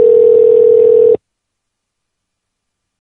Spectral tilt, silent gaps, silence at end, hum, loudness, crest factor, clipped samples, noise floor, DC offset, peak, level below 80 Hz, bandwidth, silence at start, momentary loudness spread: -9.5 dB/octave; none; 1.9 s; none; -8 LUFS; 10 dB; under 0.1%; -74 dBFS; under 0.1%; 0 dBFS; -56 dBFS; 2.7 kHz; 0 s; 4 LU